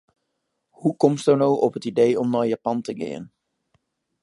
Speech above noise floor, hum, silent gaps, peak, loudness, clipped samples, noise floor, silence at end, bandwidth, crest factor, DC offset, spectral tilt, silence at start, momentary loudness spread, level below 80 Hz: 56 dB; none; none; -2 dBFS; -22 LUFS; under 0.1%; -77 dBFS; 0.95 s; 11.5 kHz; 20 dB; under 0.1%; -7 dB/octave; 0.8 s; 12 LU; -70 dBFS